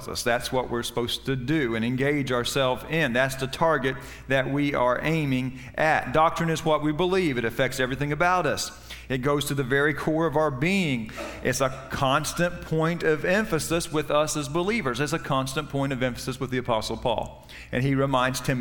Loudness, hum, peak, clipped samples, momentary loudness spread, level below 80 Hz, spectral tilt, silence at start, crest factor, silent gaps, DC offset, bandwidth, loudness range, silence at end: -25 LUFS; none; -8 dBFS; under 0.1%; 6 LU; -46 dBFS; -5 dB/octave; 0 s; 18 dB; none; under 0.1%; 18 kHz; 2 LU; 0 s